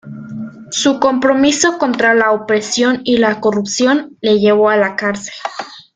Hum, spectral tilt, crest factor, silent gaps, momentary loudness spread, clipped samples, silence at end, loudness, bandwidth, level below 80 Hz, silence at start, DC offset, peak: none; -3.5 dB/octave; 14 dB; none; 14 LU; under 0.1%; 0.15 s; -13 LUFS; 9.6 kHz; -54 dBFS; 0.05 s; under 0.1%; 0 dBFS